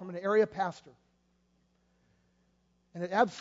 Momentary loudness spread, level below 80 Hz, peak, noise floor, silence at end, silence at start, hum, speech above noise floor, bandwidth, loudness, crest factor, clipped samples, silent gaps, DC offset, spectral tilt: 13 LU; -74 dBFS; -12 dBFS; -72 dBFS; 0 s; 0 s; none; 42 dB; 7.8 kHz; -31 LUFS; 22 dB; under 0.1%; none; under 0.1%; -6 dB/octave